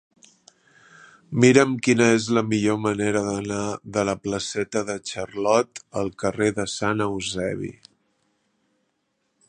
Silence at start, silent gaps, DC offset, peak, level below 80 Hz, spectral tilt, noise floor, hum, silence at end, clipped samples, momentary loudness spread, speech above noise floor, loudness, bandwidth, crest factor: 1.3 s; none; under 0.1%; 0 dBFS; -56 dBFS; -5 dB/octave; -73 dBFS; none; 1.75 s; under 0.1%; 11 LU; 51 dB; -23 LUFS; 10.5 kHz; 24 dB